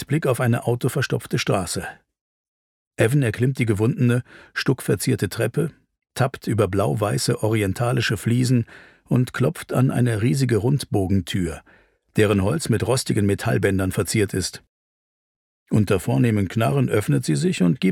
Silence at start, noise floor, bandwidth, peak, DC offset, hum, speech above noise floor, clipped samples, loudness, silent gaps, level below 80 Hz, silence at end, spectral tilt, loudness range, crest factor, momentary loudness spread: 0 s; under -90 dBFS; 16.5 kHz; -4 dBFS; under 0.1%; none; over 69 dB; under 0.1%; -22 LUFS; 2.21-2.91 s, 14.69-15.66 s; -50 dBFS; 0 s; -6 dB/octave; 2 LU; 16 dB; 6 LU